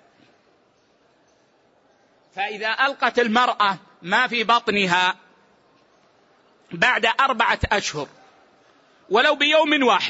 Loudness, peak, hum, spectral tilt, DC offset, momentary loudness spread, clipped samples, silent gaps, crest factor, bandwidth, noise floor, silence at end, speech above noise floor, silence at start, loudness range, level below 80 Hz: -19 LUFS; -4 dBFS; none; -3.5 dB/octave; under 0.1%; 13 LU; under 0.1%; none; 18 dB; 8 kHz; -61 dBFS; 0 s; 41 dB; 2.35 s; 3 LU; -50 dBFS